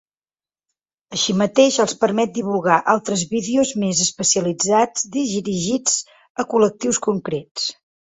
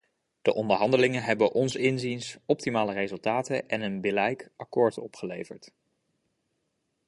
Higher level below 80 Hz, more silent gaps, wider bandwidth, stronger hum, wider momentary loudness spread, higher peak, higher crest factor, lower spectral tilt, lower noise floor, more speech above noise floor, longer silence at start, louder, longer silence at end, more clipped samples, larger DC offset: first, -60 dBFS vs -68 dBFS; first, 6.30-6.35 s, 7.51-7.55 s vs none; second, 8.4 kHz vs 11.5 kHz; neither; second, 8 LU vs 13 LU; first, 0 dBFS vs -6 dBFS; about the same, 20 dB vs 22 dB; second, -3.5 dB/octave vs -5.5 dB/octave; first, under -90 dBFS vs -78 dBFS; first, over 71 dB vs 50 dB; first, 1.1 s vs 0.45 s; first, -19 LUFS vs -27 LUFS; second, 0.3 s vs 1.4 s; neither; neither